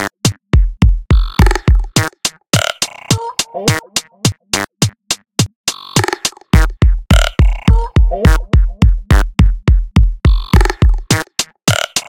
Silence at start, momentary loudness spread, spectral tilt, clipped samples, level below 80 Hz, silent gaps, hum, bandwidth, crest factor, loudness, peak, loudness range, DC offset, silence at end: 0 s; 6 LU; -4.5 dB/octave; 0.1%; -14 dBFS; 5.56-5.64 s; none; 17 kHz; 12 dB; -14 LUFS; 0 dBFS; 4 LU; under 0.1%; 0.05 s